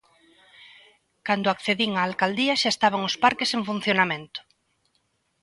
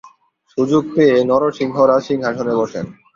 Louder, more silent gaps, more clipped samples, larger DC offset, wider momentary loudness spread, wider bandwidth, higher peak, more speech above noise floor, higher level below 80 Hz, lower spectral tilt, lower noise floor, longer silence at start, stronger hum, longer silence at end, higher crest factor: second, -23 LUFS vs -16 LUFS; neither; neither; neither; about the same, 9 LU vs 9 LU; first, 11.5 kHz vs 7.4 kHz; about the same, -4 dBFS vs -2 dBFS; first, 47 dB vs 38 dB; second, -68 dBFS vs -56 dBFS; second, -3.5 dB/octave vs -7 dB/octave; first, -71 dBFS vs -54 dBFS; first, 0.6 s vs 0.05 s; neither; first, 1.05 s vs 0.25 s; first, 22 dB vs 14 dB